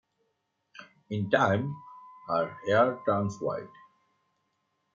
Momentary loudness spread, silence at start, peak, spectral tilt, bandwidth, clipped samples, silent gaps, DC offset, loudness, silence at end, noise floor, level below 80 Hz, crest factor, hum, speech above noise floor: 20 LU; 0.75 s; -8 dBFS; -6.5 dB/octave; 7.6 kHz; under 0.1%; none; under 0.1%; -28 LUFS; 1.25 s; -78 dBFS; -74 dBFS; 22 dB; none; 50 dB